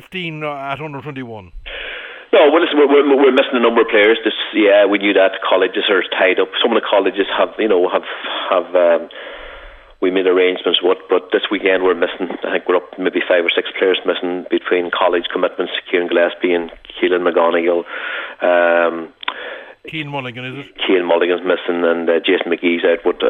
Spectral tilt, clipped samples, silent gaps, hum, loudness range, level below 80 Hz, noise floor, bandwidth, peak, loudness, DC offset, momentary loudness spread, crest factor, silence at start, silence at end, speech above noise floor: -7 dB/octave; under 0.1%; none; none; 5 LU; -50 dBFS; -38 dBFS; 4.1 kHz; 0 dBFS; -15 LUFS; under 0.1%; 15 LU; 16 dB; 0.1 s; 0 s; 22 dB